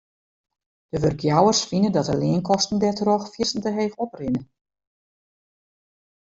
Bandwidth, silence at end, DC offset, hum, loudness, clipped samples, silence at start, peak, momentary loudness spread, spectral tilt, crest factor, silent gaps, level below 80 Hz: 7.8 kHz; 1.8 s; under 0.1%; none; -22 LUFS; under 0.1%; 0.95 s; -4 dBFS; 9 LU; -5 dB/octave; 20 dB; none; -54 dBFS